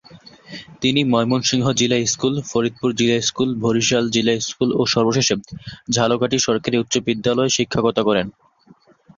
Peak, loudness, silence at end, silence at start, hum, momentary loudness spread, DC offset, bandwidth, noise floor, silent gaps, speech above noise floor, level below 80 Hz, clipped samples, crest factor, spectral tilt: -2 dBFS; -18 LUFS; 0.9 s; 0.1 s; none; 5 LU; under 0.1%; 7.6 kHz; -52 dBFS; none; 33 dB; -52 dBFS; under 0.1%; 16 dB; -4 dB/octave